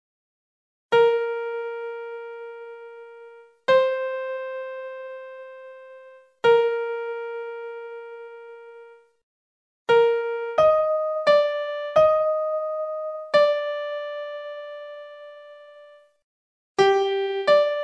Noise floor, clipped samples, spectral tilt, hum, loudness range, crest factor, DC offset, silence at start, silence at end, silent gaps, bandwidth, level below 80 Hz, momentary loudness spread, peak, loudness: -50 dBFS; under 0.1%; -4 dB/octave; none; 6 LU; 18 dB; under 0.1%; 0.9 s; 0 s; 9.23-9.86 s, 16.24-16.75 s; 8.4 kHz; -66 dBFS; 22 LU; -6 dBFS; -23 LUFS